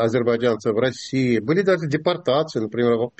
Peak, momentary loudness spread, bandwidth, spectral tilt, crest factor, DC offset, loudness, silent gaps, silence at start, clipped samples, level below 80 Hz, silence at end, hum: -6 dBFS; 3 LU; 8.4 kHz; -6.5 dB/octave; 14 dB; under 0.1%; -21 LUFS; none; 0 s; under 0.1%; -60 dBFS; 0.1 s; none